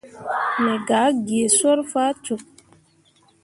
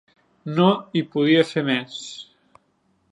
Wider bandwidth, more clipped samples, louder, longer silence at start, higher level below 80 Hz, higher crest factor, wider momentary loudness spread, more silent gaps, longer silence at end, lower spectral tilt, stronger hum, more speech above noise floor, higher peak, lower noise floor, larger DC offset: about the same, 11.5 kHz vs 11 kHz; neither; about the same, -20 LUFS vs -20 LUFS; second, 0.05 s vs 0.45 s; about the same, -66 dBFS vs -70 dBFS; about the same, 18 dB vs 20 dB; second, 12 LU vs 18 LU; neither; about the same, 1 s vs 0.9 s; second, -2.5 dB/octave vs -6 dB/octave; neither; second, 38 dB vs 45 dB; about the same, -4 dBFS vs -2 dBFS; second, -58 dBFS vs -66 dBFS; neither